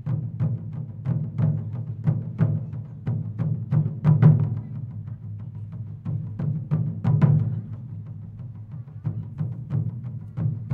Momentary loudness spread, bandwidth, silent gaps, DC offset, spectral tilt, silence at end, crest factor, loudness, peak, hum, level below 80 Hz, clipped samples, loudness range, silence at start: 17 LU; 3.1 kHz; none; under 0.1%; -12 dB/octave; 0 s; 22 dB; -26 LUFS; -4 dBFS; none; -52 dBFS; under 0.1%; 4 LU; 0 s